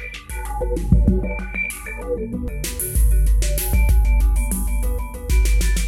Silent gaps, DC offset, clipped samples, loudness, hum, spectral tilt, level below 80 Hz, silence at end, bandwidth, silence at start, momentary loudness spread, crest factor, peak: none; under 0.1%; under 0.1%; -21 LUFS; none; -5 dB/octave; -18 dBFS; 0 s; 16 kHz; 0 s; 9 LU; 16 dB; -2 dBFS